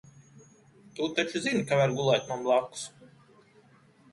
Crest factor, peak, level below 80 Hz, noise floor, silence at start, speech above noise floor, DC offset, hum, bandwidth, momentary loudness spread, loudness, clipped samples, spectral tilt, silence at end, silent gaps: 20 dB; -10 dBFS; -70 dBFS; -60 dBFS; 0.95 s; 32 dB; under 0.1%; none; 11.5 kHz; 15 LU; -28 LUFS; under 0.1%; -4.5 dB/octave; 1.05 s; none